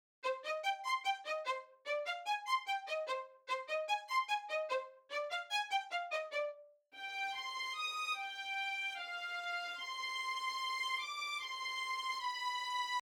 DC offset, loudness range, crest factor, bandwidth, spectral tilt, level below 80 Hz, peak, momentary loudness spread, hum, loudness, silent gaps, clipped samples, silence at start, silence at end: under 0.1%; 1 LU; 16 dB; 20 kHz; 3.5 dB/octave; under -90 dBFS; -24 dBFS; 5 LU; none; -39 LUFS; none; under 0.1%; 0.25 s; 0 s